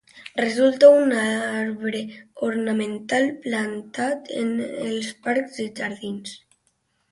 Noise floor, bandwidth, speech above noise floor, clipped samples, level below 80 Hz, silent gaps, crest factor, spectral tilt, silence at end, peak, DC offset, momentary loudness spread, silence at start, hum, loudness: -69 dBFS; 11.5 kHz; 47 dB; under 0.1%; -70 dBFS; none; 20 dB; -4.5 dB/octave; 0.75 s; -2 dBFS; under 0.1%; 17 LU; 0.15 s; none; -22 LUFS